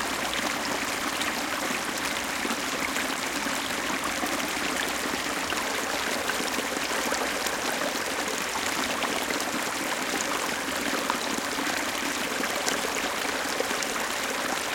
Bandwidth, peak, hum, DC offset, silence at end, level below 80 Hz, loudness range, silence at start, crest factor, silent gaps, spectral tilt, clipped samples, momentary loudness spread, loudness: 17 kHz; -4 dBFS; none; under 0.1%; 0 s; -56 dBFS; 0 LU; 0 s; 24 dB; none; -1.5 dB/octave; under 0.1%; 1 LU; -27 LUFS